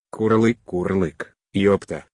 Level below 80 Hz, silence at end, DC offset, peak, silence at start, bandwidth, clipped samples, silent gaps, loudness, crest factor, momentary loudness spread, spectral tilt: -54 dBFS; 0.15 s; under 0.1%; -6 dBFS; 0.15 s; 10.5 kHz; under 0.1%; none; -21 LUFS; 16 dB; 9 LU; -7.5 dB/octave